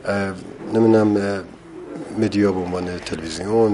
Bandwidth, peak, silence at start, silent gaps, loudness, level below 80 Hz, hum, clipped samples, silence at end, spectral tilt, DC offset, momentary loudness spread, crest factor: 11.5 kHz; -4 dBFS; 0 s; none; -20 LUFS; -46 dBFS; none; under 0.1%; 0 s; -6.5 dB/octave; under 0.1%; 18 LU; 16 dB